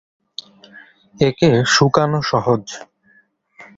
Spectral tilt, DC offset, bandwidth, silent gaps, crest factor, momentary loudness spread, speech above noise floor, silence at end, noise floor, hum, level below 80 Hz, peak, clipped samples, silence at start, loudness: -5 dB/octave; under 0.1%; 8 kHz; none; 18 dB; 21 LU; 41 dB; 0.15 s; -56 dBFS; none; -50 dBFS; -2 dBFS; under 0.1%; 0.75 s; -16 LUFS